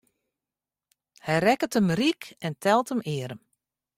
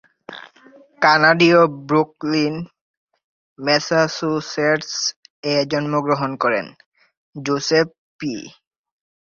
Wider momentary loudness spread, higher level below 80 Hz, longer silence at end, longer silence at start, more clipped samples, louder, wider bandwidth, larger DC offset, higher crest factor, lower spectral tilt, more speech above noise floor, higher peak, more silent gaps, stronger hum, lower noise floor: second, 14 LU vs 19 LU; about the same, -66 dBFS vs -62 dBFS; second, 0.6 s vs 0.85 s; first, 1.25 s vs 0.3 s; neither; second, -25 LUFS vs -18 LUFS; first, 16 kHz vs 7.4 kHz; neither; about the same, 20 dB vs 18 dB; about the same, -5.5 dB/octave vs -4.5 dB/octave; first, over 65 dB vs 31 dB; second, -8 dBFS vs -2 dBFS; second, none vs 2.81-3.07 s, 3.24-3.56 s, 5.16-5.23 s, 5.30-5.43 s, 6.86-6.92 s, 7.17-7.33 s, 7.98-8.19 s; first, 50 Hz at -60 dBFS vs none; first, under -90 dBFS vs -49 dBFS